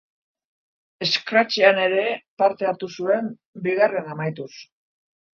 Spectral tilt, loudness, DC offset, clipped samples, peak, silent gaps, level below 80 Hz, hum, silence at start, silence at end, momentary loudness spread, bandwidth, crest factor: -4.5 dB/octave; -21 LUFS; under 0.1%; under 0.1%; 0 dBFS; 2.28-2.37 s, 3.45-3.53 s; -76 dBFS; none; 1 s; 0.75 s; 13 LU; 7.2 kHz; 22 dB